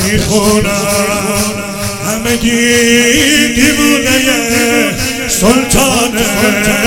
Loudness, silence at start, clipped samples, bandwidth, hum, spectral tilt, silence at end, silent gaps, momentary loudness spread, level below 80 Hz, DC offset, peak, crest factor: -10 LUFS; 0 s; 0.6%; over 20 kHz; none; -3 dB/octave; 0 s; none; 7 LU; -28 dBFS; under 0.1%; 0 dBFS; 10 dB